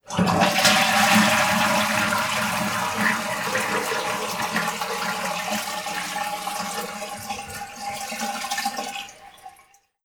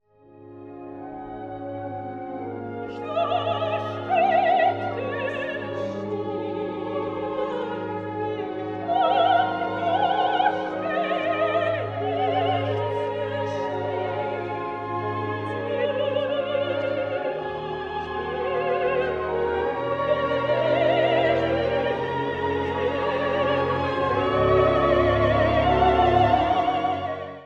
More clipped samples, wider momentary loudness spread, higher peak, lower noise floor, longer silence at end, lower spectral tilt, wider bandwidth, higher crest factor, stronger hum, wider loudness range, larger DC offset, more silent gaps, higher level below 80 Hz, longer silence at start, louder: neither; first, 15 LU vs 11 LU; about the same, -4 dBFS vs -6 dBFS; first, -56 dBFS vs -49 dBFS; first, 0.55 s vs 0 s; second, -2.5 dB/octave vs -7.5 dB/octave; first, over 20 kHz vs 7.6 kHz; about the same, 20 dB vs 18 dB; neither; about the same, 10 LU vs 8 LU; neither; neither; second, -56 dBFS vs -44 dBFS; second, 0.05 s vs 0.35 s; about the same, -22 LUFS vs -24 LUFS